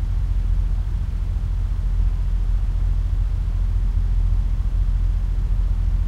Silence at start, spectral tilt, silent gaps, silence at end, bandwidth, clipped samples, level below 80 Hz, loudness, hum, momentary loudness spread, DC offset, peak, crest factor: 0 s; -8 dB/octave; none; 0 s; 3.7 kHz; under 0.1%; -20 dBFS; -24 LUFS; none; 2 LU; under 0.1%; -8 dBFS; 10 dB